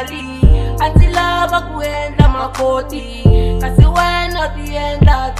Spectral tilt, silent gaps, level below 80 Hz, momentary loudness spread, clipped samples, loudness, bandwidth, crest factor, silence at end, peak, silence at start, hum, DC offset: -6.5 dB/octave; none; -16 dBFS; 9 LU; 0.3%; -14 LUFS; 14 kHz; 12 dB; 0 s; 0 dBFS; 0 s; none; under 0.1%